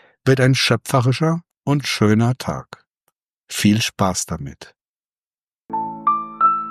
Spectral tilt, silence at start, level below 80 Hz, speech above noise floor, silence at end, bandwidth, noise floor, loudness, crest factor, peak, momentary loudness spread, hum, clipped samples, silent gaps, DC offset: -5 dB/octave; 0.25 s; -52 dBFS; over 72 dB; 0 s; 14.5 kHz; under -90 dBFS; -19 LUFS; 18 dB; -2 dBFS; 12 LU; none; under 0.1%; 1.57-1.62 s, 2.97-3.07 s, 3.23-3.27 s, 3.33-3.37 s, 3.43-3.47 s, 4.88-5.51 s; under 0.1%